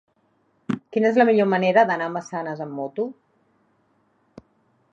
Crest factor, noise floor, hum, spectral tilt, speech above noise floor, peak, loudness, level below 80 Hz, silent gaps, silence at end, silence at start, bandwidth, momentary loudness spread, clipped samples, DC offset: 20 dB; -66 dBFS; none; -6.5 dB/octave; 45 dB; -4 dBFS; -22 LUFS; -74 dBFS; none; 1.8 s; 0.7 s; 7.8 kHz; 13 LU; under 0.1%; under 0.1%